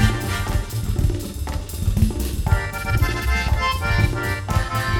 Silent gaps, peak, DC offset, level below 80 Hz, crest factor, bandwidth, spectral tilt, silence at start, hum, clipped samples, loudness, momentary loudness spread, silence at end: none; -4 dBFS; under 0.1%; -24 dBFS; 16 dB; 19.5 kHz; -5 dB/octave; 0 s; none; under 0.1%; -22 LUFS; 5 LU; 0 s